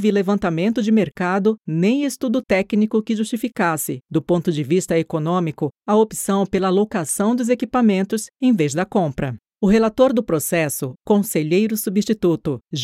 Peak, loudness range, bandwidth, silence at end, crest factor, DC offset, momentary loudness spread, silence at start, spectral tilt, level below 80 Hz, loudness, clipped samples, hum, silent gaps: -2 dBFS; 2 LU; 16 kHz; 0 s; 16 dB; under 0.1%; 6 LU; 0 s; -5.5 dB/octave; -50 dBFS; -19 LUFS; under 0.1%; none; none